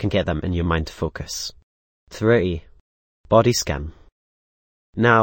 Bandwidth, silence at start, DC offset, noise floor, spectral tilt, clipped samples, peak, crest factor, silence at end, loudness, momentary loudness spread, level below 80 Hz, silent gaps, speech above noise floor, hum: 16.5 kHz; 0 s; under 0.1%; under -90 dBFS; -5 dB/octave; under 0.1%; -2 dBFS; 20 dB; 0 s; -21 LUFS; 15 LU; -38 dBFS; 1.63-2.07 s, 2.80-3.24 s, 4.12-4.93 s; over 70 dB; none